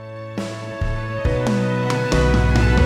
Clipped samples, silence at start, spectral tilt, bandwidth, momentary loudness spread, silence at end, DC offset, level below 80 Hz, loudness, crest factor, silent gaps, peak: under 0.1%; 0 s; -6.5 dB/octave; 12 kHz; 12 LU; 0 s; under 0.1%; -24 dBFS; -20 LUFS; 14 dB; none; -4 dBFS